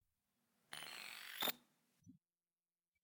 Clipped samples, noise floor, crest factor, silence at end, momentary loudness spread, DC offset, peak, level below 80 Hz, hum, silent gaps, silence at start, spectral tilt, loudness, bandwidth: under 0.1%; under -90 dBFS; 28 dB; 0.85 s; 13 LU; under 0.1%; -24 dBFS; under -90 dBFS; none; none; 0.7 s; -0.5 dB/octave; -46 LUFS; 19.5 kHz